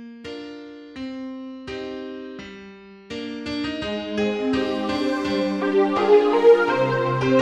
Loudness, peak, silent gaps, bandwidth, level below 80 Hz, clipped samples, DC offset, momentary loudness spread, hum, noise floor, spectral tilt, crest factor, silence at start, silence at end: -21 LUFS; -4 dBFS; none; 9.6 kHz; -54 dBFS; under 0.1%; under 0.1%; 21 LU; none; -43 dBFS; -6.5 dB/octave; 18 dB; 0 s; 0 s